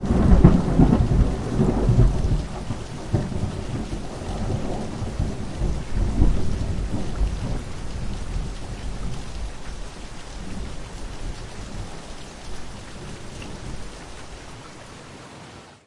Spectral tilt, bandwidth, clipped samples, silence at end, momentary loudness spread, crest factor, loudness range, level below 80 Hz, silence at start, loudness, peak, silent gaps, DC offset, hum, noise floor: -7.5 dB/octave; 11.5 kHz; under 0.1%; 0.15 s; 20 LU; 22 dB; 15 LU; -28 dBFS; 0 s; -25 LUFS; 0 dBFS; none; under 0.1%; none; -43 dBFS